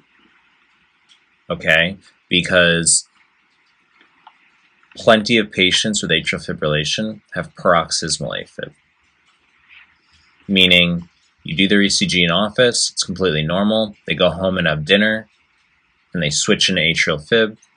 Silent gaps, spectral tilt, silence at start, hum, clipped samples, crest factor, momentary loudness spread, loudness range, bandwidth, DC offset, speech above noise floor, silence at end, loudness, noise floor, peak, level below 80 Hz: none; -3 dB/octave; 1.5 s; none; under 0.1%; 18 dB; 13 LU; 5 LU; 13 kHz; under 0.1%; 44 dB; 0.2 s; -16 LUFS; -61 dBFS; 0 dBFS; -52 dBFS